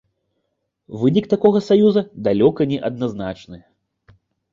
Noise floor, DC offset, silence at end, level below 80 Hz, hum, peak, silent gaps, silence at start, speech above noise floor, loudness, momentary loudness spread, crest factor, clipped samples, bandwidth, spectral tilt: -74 dBFS; under 0.1%; 0.95 s; -54 dBFS; none; -2 dBFS; none; 0.9 s; 56 dB; -18 LUFS; 15 LU; 18 dB; under 0.1%; 7.4 kHz; -8.5 dB/octave